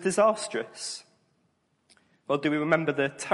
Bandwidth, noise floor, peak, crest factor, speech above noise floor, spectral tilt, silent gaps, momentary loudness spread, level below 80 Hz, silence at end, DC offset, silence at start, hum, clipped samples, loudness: 11.5 kHz; -71 dBFS; -8 dBFS; 20 dB; 45 dB; -4.5 dB/octave; none; 12 LU; -74 dBFS; 0 s; under 0.1%; 0 s; none; under 0.1%; -27 LUFS